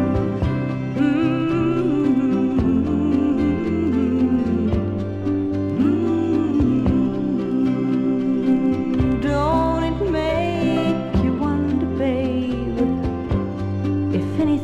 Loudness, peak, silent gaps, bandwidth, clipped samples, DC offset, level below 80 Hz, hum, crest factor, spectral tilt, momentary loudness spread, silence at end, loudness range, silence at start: -20 LUFS; -6 dBFS; none; 8 kHz; under 0.1%; under 0.1%; -36 dBFS; none; 12 dB; -8.5 dB/octave; 4 LU; 0 s; 2 LU; 0 s